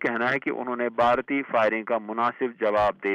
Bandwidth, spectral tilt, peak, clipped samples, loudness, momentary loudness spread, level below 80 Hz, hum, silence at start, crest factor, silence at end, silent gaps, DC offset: 8.8 kHz; -6.5 dB/octave; -12 dBFS; under 0.1%; -25 LUFS; 6 LU; -58 dBFS; none; 0 s; 14 dB; 0 s; none; under 0.1%